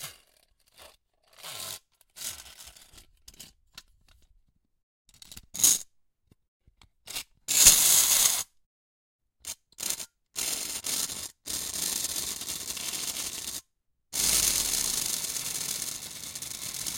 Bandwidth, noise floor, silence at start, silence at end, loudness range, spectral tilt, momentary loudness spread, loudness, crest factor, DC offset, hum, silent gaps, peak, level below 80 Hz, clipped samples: 17 kHz; -76 dBFS; 0 s; 0 s; 20 LU; 1 dB/octave; 22 LU; -25 LUFS; 30 dB; under 0.1%; none; 4.83-5.05 s, 6.48-6.60 s, 8.66-9.19 s; -2 dBFS; -56 dBFS; under 0.1%